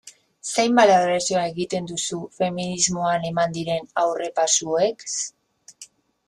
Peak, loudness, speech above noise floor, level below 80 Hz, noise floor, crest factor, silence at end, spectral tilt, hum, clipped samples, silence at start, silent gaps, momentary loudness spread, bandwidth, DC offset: -4 dBFS; -22 LUFS; 27 dB; -62 dBFS; -49 dBFS; 18 dB; 0.4 s; -3 dB/octave; none; under 0.1%; 0.05 s; none; 11 LU; 12.5 kHz; under 0.1%